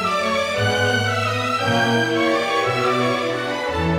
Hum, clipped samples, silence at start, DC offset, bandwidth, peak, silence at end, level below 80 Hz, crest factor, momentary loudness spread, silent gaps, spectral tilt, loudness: none; under 0.1%; 0 s; under 0.1%; 18.5 kHz; -6 dBFS; 0 s; -46 dBFS; 14 dB; 4 LU; none; -4.5 dB/octave; -19 LUFS